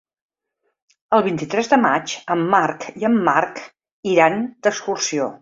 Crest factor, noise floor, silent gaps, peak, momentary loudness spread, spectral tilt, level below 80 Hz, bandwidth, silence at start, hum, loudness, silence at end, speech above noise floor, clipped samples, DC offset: 18 dB; -73 dBFS; 3.92-4.03 s; -2 dBFS; 8 LU; -4 dB/octave; -64 dBFS; 7.8 kHz; 1.1 s; none; -19 LUFS; 0.05 s; 55 dB; under 0.1%; under 0.1%